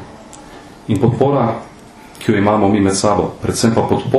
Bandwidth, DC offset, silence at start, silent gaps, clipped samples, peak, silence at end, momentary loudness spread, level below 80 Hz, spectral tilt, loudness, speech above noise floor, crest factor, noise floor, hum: 13 kHz; under 0.1%; 0 s; none; under 0.1%; 0 dBFS; 0 s; 21 LU; -44 dBFS; -6 dB/octave; -15 LUFS; 23 dB; 16 dB; -37 dBFS; none